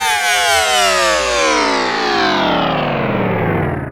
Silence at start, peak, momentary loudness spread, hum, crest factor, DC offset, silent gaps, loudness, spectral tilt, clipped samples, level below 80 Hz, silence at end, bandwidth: 0 s; -2 dBFS; 5 LU; none; 14 dB; under 0.1%; none; -14 LUFS; -3 dB/octave; under 0.1%; -40 dBFS; 0 s; over 20 kHz